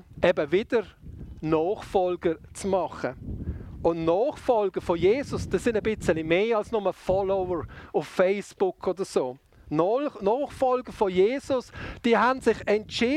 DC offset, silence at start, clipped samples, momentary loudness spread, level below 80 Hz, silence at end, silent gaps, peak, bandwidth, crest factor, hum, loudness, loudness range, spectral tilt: under 0.1%; 0.15 s; under 0.1%; 9 LU; -48 dBFS; 0 s; none; -6 dBFS; 13 kHz; 20 dB; none; -26 LUFS; 3 LU; -6 dB/octave